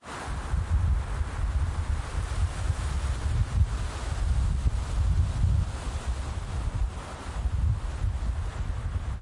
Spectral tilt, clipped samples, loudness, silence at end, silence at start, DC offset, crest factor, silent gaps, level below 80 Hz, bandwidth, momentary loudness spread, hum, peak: -6 dB/octave; under 0.1%; -30 LUFS; 0 s; 0.05 s; under 0.1%; 14 dB; none; -30 dBFS; 11.5 kHz; 7 LU; none; -12 dBFS